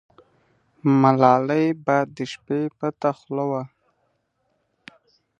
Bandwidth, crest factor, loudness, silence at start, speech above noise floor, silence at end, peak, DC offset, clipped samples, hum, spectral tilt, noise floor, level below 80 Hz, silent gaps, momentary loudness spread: 8 kHz; 22 dB; -21 LUFS; 0.85 s; 50 dB; 1.75 s; 0 dBFS; under 0.1%; under 0.1%; none; -8 dB/octave; -71 dBFS; -70 dBFS; none; 12 LU